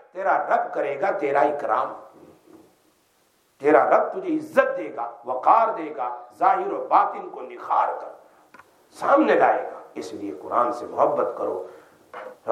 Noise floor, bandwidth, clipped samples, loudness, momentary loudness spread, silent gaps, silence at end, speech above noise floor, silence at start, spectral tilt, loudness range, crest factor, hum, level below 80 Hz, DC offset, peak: -64 dBFS; 13 kHz; under 0.1%; -22 LUFS; 17 LU; none; 0 s; 41 dB; 0.15 s; -5.5 dB/octave; 3 LU; 20 dB; none; -82 dBFS; under 0.1%; -4 dBFS